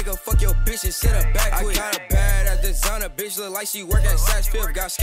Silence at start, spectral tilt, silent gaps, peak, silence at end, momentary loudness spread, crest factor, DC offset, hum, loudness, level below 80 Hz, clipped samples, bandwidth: 0 s; -3.5 dB/octave; none; -6 dBFS; 0 s; 5 LU; 12 dB; under 0.1%; none; -22 LUFS; -20 dBFS; under 0.1%; 16.5 kHz